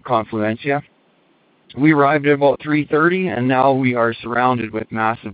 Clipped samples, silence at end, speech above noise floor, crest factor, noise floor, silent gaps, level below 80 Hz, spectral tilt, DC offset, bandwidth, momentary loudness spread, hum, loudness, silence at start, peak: under 0.1%; 0 s; 40 dB; 16 dB; -57 dBFS; none; -58 dBFS; -11.5 dB/octave; under 0.1%; 4.9 kHz; 8 LU; none; -17 LUFS; 0.05 s; -2 dBFS